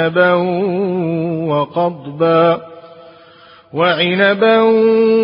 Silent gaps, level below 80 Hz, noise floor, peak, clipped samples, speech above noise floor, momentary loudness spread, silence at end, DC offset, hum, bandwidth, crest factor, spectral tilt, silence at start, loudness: none; -60 dBFS; -43 dBFS; 0 dBFS; under 0.1%; 30 dB; 8 LU; 0 s; under 0.1%; none; 5.4 kHz; 14 dB; -11.5 dB/octave; 0 s; -14 LUFS